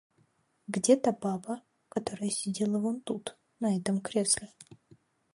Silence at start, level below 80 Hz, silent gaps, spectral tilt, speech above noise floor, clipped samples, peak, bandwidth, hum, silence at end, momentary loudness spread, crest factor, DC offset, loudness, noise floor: 0.7 s; -70 dBFS; none; -4.5 dB/octave; 40 dB; under 0.1%; -10 dBFS; 11.5 kHz; none; 0.6 s; 14 LU; 22 dB; under 0.1%; -31 LUFS; -70 dBFS